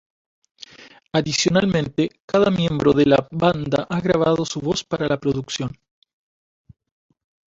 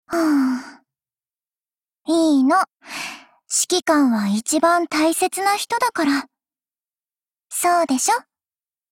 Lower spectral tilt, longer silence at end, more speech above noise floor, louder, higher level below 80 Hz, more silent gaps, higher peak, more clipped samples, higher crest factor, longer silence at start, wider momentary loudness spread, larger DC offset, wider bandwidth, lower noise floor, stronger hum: first, -5.5 dB/octave vs -3 dB/octave; first, 1.85 s vs 0.7 s; second, 28 dB vs over 71 dB; about the same, -20 LUFS vs -19 LUFS; first, -50 dBFS vs -64 dBFS; first, 2.20-2.28 s vs none; first, -2 dBFS vs -6 dBFS; neither; about the same, 20 dB vs 16 dB; first, 0.8 s vs 0.1 s; second, 8 LU vs 12 LU; neither; second, 8 kHz vs 17 kHz; second, -47 dBFS vs under -90 dBFS; neither